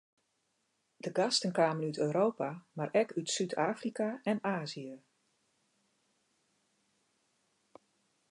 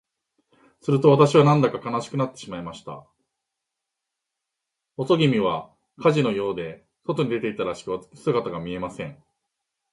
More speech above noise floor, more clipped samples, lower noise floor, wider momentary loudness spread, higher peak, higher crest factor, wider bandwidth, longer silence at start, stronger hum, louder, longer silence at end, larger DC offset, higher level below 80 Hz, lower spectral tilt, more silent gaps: second, 46 dB vs 61 dB; neither; second, -79 dBFS vs -84 dBFS; second, 10 LU vs 20 LU; second, -14 dBFS vs -2 dBFS; about the same, 22 dB vs 22 dB; about the same, 11 kHz vs 11 kHz; first, 1.05 s vs 0.85 s; neither; second, -33 LUFS vs -22 LUFS; first, 3.3 s vs 0.8 s; neither; second, -86 dBFS vs -60 dBFS; second, -4.5 dB/octave vs -7 dB/octave; neither